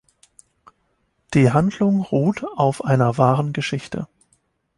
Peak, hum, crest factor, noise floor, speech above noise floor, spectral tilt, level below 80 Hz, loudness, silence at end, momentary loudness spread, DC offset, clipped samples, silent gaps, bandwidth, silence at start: -2 dBFS; none; 20 dB; -68 dBFS; 49 dB; -7.5 dB/octave; -54 dBFS; -19 LUFS; 0.75 s; 11 LU; under 0.1%; under 0.1%; none; 11.5 kHz; 1.3 s